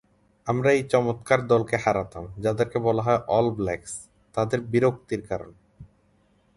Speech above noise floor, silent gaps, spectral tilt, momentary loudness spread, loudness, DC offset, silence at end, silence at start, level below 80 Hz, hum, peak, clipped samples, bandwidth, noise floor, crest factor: 39 dB; none; -6.5 dB/octave; 12 LU; -24 LUFS; under 0.1%; 0.7 s; 0.45 s; -52 dBFS; none; -6 dBFS; under 0.1%; 11.5 kHz; -63 dBFS; 20 dB